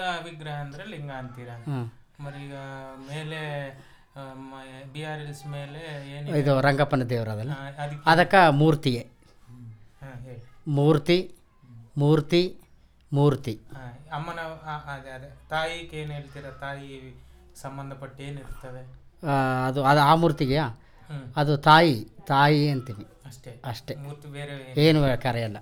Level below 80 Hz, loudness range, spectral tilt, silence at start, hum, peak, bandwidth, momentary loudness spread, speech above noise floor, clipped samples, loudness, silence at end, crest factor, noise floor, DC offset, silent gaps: -52 dBFS; 15 LU; -6.5 dB/octave; 0 s; none; -4 dBFS; 16.5 kHz; 22 LU; 25 dB; under 0.1%; -24 LUFS; 0 s; 22 dB; -50 dBFS; under 0.1%; none